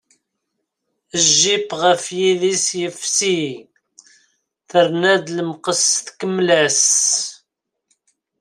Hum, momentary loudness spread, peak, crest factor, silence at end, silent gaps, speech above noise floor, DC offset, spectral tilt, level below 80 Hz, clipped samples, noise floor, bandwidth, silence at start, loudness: none; 11 LU; 0 dBFS; 18 dB; 1.05 s; none; 59 dB; under 0.1%; -2 dB/octave; -66 dBFS; under 0.1%; -76 dBFS; 16 kHz; 1.15 s; -16 LUFS